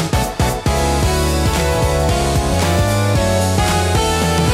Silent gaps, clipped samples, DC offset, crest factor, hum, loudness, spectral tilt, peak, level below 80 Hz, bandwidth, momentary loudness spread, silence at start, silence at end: none; under 0.1%; under 0.1%; 12 dB; none; -16 LUFS; -5 dB/octave; -4 dBFS; -24 dBFS; 16.5 kHz; 2 LU; 0 s; 0 s